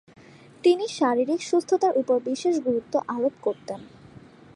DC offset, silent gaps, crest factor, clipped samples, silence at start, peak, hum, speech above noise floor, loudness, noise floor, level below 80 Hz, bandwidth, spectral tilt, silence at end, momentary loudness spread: under 0.1%; none; 16 dB; under 0.1%; 0.65 s; -10 dBFS; none; 25 dB; -24 LUFS; -48 dBFS; -68 dBFS; 11.5 kHz; -4.5 dB/octave; 0.4 s; 8 LU